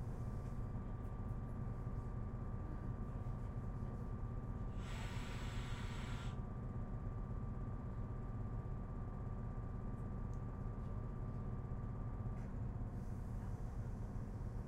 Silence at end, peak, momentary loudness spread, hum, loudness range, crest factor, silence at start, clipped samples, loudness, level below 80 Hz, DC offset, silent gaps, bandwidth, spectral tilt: 0 s; -32 dBFS; 1 LU; none; 1 LU; 12 dB; 0 s; under 0.1%; -47 LUFS; -48 dBFS; under 0.1%; none; 10.5 kHz; -7.5 dB/octave